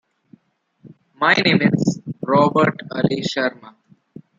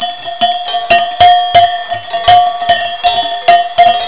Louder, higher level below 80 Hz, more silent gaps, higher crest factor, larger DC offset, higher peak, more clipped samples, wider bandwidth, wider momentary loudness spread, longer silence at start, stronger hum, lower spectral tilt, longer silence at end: second, -18 LUFS vs -10 LUFS; second, -60 dBFS vs -42 dBFS; neither; first, 18 dB vs 10 dB; second, under 0.1% vs 2%; about the same, -2 dBFS vs 0 dBFS; neither; first, 7.8 kHz vs 4 kHz; about the same, 8 LU vs 8 LU; first, 1.2 s vs 0 s; neither; about the same, -6 dB/octave vs -6.5 dB/octave; first, 0.7 s vs 0 s